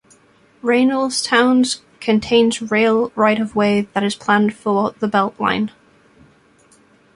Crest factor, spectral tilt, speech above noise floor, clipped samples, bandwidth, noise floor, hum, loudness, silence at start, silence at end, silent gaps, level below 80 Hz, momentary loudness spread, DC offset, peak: 16 dB; -4.5 dB/octave; 36 dB; under 0.1%; 11.5 kHz; -53 dBFS; none; -17 LUFS; 0.65 s; 1.5 s; none; -56 dBFS; 6 LU; under 0.1%; -2 dBFS